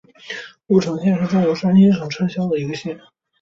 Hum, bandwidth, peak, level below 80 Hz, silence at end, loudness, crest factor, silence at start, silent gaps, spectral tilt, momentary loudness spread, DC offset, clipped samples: none; 7.2 kHz; -4 dBFS; -58 dBFS; 0.45 s; -18 LUFS; 16 dB; 0.25 s; none; -7.5 dB/octave; 18 LU; under 0.1%; under 0.1%